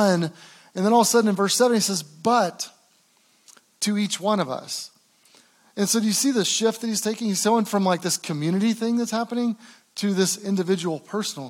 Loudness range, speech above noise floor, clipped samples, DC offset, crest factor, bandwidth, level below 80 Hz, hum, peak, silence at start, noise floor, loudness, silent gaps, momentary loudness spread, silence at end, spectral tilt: 4 LU; 39 dB; under 0.1%; under 0.1%; 18 dB; 17 kHz; -86 dBFS; none; -6 dBFS; 0 s; -61 dBFS; -23 LUFS; none; 11 LU; 0 s; -4 dB/octave